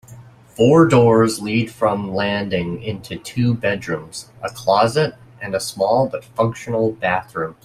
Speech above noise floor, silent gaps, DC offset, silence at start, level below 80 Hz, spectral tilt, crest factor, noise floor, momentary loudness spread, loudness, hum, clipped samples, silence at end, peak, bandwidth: 24 dB; none; under 0.1%; 0.1 s; -52 dBFS; -6 dB/octave; 16 dB; -42 dBFS; 15 LU; -18 LUFS; none; under 0.1%; 0.1 s; -2 dBFS; 14.5 kHz